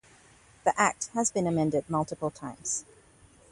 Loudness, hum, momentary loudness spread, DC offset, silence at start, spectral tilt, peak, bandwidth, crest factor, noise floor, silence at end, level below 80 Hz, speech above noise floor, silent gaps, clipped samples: -29 LUFS; none; 9 LU; under 0.1%; 0.65 s; -4.5 dB/octave; -10 dBFS; 11.5 kHz; 22 dB; -58 dBFS; 0.7 s; -62 dBFS; 29 dB; none; under 0.1%